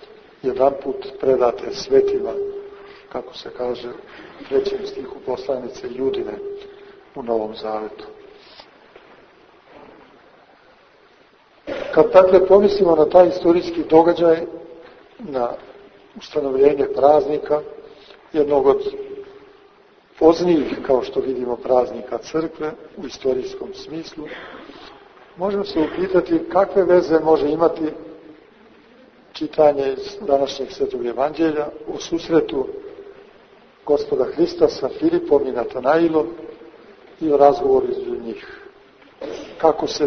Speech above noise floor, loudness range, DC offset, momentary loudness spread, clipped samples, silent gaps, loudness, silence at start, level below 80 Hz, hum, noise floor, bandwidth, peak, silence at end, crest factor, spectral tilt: 34 dB; 12 LU; under 0.1%; 20 LU; under 0.1%; none; -19 LUFS; 0.45 s; -52 dBFS; none; -53 dBFS; 6.6 kHz; 0 dBFS; 0 s; 20 dB; -6 dB/octave